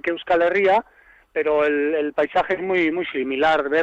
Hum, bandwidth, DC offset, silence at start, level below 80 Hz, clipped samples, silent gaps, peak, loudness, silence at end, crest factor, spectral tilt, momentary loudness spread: none; 8.2 kHz; under 0.1%; 0.05 s; -56 dBFS; under 0.1%; none; -10 dBFS; -20 LUFS; 0 s; 10 dB; -6 dB/octave; 6 LU